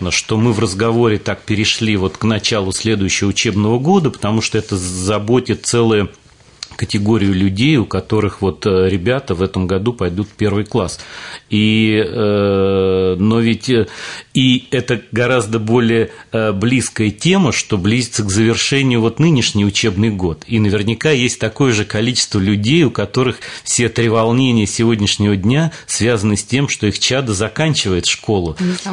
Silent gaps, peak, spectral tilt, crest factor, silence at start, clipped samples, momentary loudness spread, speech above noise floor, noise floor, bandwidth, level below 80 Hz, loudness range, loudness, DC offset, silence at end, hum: none; -2 dBFS; -5 dB/octave; 12 dB; 0 s; under 0.1%; 6 LU; 21 dB; -36 dBFS; 11 kHz; -46 dBFS; 2 LU; -15 LUFS; 0.2%; 0 s; none